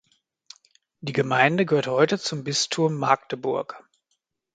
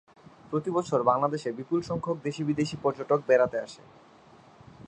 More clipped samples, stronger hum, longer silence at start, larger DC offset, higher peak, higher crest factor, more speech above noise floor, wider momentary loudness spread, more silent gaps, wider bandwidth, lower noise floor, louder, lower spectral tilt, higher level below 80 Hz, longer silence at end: neither; neither; first, 1.05 s vs 0.5 s; neither; first, -2 dBFS vs -8 dBFS; about the same, 22 dB vs 20 dB; first, 53 dB vs 27 dB; about the same, 9 LU vs 9 LU; neither; about the same, 9.4 kHz vs 9.8 kHz; first, -76 dBFS vs -55 dBFS; first, -23 LUFS vs -28 LUFS; second, -4.5 dB/octave vs -6.5 dB/octave; about the same, -68 dBFS vs -64 dBFS; first, 0.75 s vs 0 s